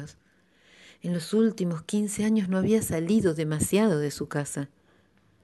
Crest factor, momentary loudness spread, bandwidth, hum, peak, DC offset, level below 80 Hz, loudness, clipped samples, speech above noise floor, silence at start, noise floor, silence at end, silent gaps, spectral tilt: 16 dB; 10 LU; 12 kHz; none; -10 dBFS; under 0.1%; -56 dBFS; -26 LUFS; under 0.1%; 38 dB; 0 s; -63 dBFS; 0.75 s; none; -6 dB/octave